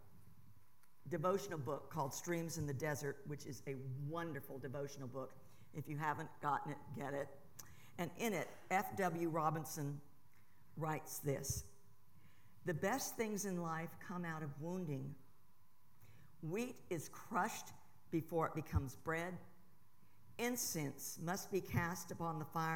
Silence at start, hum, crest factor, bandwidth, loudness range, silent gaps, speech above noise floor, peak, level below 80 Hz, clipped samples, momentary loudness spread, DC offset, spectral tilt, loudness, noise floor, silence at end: 0.05 s; none; 22 dB; 18 kHz; 4 LU; none; 32 dB; -22 dBFS; -66 dBFS; under 0.1%; 11 LU; 0.2%; -5 dB/octave; -43 LUFS; -74 dBFS; 0 s